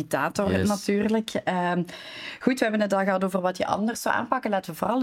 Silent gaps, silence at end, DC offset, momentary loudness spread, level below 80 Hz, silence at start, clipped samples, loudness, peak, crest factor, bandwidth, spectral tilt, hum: none; 0 s; under 0.1%; 5 LU; -60 dBFS; 0 s; under 0.1%; -25 LUFS; -6 dBFS; 18 dB; 17 kHz; -5.5 dB/octave; none